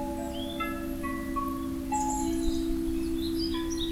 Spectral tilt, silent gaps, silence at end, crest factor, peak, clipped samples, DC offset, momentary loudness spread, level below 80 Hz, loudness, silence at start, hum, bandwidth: -4.5 dB/octave; none; 0 s; 14 dB; -16 dBFS; under 0.1%; under 0.1%; 5 LU; -40 dBFS; -31 LUFS; 0 s; none; 16.5 kHz